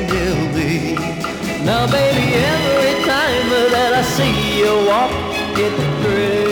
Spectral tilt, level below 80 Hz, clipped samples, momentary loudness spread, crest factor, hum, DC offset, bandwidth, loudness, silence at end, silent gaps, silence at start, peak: -5 dB/octave; -36 dBFS; under 0.1%; 6 LU; 10 dB; none; under 0.1%; over 20 kHz; -16 LUFS; 0 s; none; 0 s; -6 dBFS